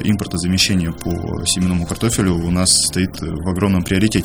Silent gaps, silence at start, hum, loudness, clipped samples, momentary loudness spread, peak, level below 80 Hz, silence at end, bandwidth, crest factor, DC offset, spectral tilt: none; 0 s; none; -17 LUFS; under 0.1%; 9 LU; 0 dBFS; -34 dBFS; 0 s; over 20 kHz; 16 dB; under 0.1%; -4 dB/octave